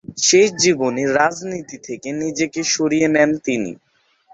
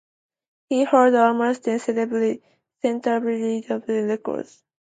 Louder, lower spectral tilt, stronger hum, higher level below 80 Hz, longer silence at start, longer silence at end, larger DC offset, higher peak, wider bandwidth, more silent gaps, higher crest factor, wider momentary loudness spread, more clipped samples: first, -17 LUFS vs -22 LUFS; second, -3 dB/octave vs -5.5 dB/octave; neither; first, -58 dBFS vs -74 dBFS; second, 0.1 s vs 0.7 s; first, 0.6 s vs 0.45 s; neither; about the same, -2 dBFS vs -4 dBFS; second, 8.2 kHz vs 9.2 kHz; neither; about the same, 18 dB vs 18 dB; first, 16 LU vs 11 LU; neither